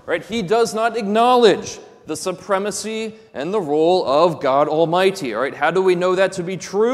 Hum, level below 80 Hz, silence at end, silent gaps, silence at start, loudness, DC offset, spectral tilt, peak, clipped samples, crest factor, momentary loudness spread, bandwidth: none; -60 dBFS; 0 s; none; 0.05 s; -18 LUFS; under 0.1%; -4.5 dB/octave; 0 dBFS; under 0.1%; 18 dB; 11 LU; 14 kHz